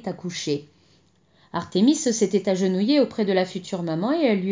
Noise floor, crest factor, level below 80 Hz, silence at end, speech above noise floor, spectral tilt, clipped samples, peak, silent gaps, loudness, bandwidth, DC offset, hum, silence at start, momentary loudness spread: -60 dBFS; 16 dB; -66 dBFS; 0 s; 38 dB; -5 dB/octave; under 0.1%; -6 dBFS; none; -23 LUFS; 7.8 kHz; under 0.1%; none; 0.05 s; 10 LU